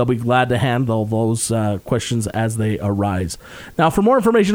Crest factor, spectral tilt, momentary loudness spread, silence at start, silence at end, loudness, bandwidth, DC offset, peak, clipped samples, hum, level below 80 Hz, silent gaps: 16 dB; -6 dB/octave; 7 LU; 0 s; 0 s; -18 LUFS; over 20 kHz; under 0.1%; -2 dBFS; under 0.1%; none; -44 dBFS; none